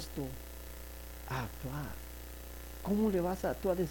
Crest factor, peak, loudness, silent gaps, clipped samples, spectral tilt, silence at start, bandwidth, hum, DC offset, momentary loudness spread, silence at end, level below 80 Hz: 16 dB; -20 dBFS; -38 LUFS; none; under 0.1%; -6 dB/octave; 0 s; 19 kHz; 60 Hz at -50 dBFS; under 0.1%; 15 LU; 0 s; -48 dBFS